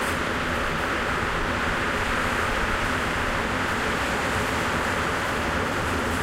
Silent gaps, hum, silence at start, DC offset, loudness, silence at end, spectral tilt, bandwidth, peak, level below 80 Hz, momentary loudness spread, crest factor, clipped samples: none; none; 0 s; under 0.1%; -25 LUFS; 0 s; -4 dB/octave; 16 kHz; -12 dBFS; -36 dBFS; 1 LU; 14 dB; under 0.1%